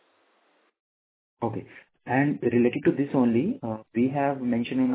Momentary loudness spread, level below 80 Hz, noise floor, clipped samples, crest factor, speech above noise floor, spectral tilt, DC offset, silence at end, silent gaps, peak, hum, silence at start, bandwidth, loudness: 10 LU; -64 dBFS; -67 dBFS; under 0.1%; 18 dB; 42 dB; -7 dB/octave; under 0.1%; 0 s; none; -8 dBFS; none; 1.4 s; 4 kHz; -26 LUFS